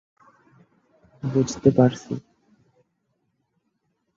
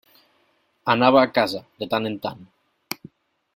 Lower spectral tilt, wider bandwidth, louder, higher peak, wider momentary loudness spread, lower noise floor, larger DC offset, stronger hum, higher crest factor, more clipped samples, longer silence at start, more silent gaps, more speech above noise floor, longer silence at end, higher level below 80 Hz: first, -7 dB/octave vs -5.5 dB/octave; second, 7.8 kHz vs 16.5 kHz; about the same, -22 LUFS vs -21 LUFS; about the same, -2 dBFS vs -2 dBFS; about the same, 16 LU vs 18 LU; first, -74 dBFS vs -65 dBFS; neither; neither; about the same, 24 dB vs 22 dB; neither; first, 1.25 s vs 0.85 s; neither; first, 53 dB vs 45 dB; first, 1.95 s vs 1.1 s; first, -58 dBFS vs -66 dBFS